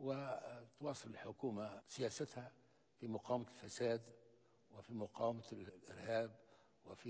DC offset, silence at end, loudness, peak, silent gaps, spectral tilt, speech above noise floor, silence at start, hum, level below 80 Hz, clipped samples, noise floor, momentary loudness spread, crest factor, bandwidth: under 0.1%; 0 s; -47 LUFS; -28 dBFS; none; -5.5 dB/octave; 26 dB; 0 s; none; -80 dBFS; under 0.1%; -72 dBFS; 14 LU; 20 dB; 8 kHz